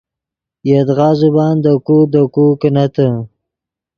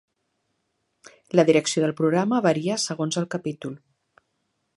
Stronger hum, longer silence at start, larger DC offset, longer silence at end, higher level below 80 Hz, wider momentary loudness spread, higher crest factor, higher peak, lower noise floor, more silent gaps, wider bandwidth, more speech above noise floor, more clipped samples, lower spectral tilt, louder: neither; second, 0.65 s vs 1.35 s; neither; second, 0.7 s vs 1 s; first, -54 dBFS vs -72 dBFS; second, 6 LU vs 14 LU; second, 12 dB vs 22 dB; first, 0 dBFS vs -4 dBFS; first, -84 dBFS vs -75 dBFS; neither; second, 6.8 kHz vs 11.5 kHz; first, 73 dB vs 52 dB; neither; first, -10 dB/octave vs -5 dB/octave; first, -12 LUFS vs -23 LUFS